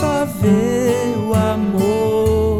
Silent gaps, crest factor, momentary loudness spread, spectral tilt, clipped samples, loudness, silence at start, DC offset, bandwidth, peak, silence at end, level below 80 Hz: none; 12 dB; 2 LU; -7 dB/octave; under 0.1%; -17 LUFS; 0 s; under 0.1%; 18 kHz; -4 dBFS; 0 s; -34 dBFS